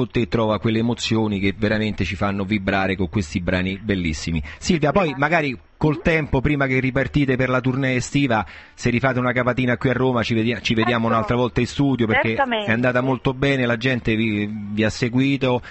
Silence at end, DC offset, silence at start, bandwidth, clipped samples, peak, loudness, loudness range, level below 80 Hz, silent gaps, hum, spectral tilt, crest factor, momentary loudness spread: 0 s; under 0.1%; 0 s; 8.6 kHz; under 0.1%; -4 dBFS; -20 LUFS; 2 LU; -38 dBFS; none; none; -6 dB/octave; 16 dB; 5 LU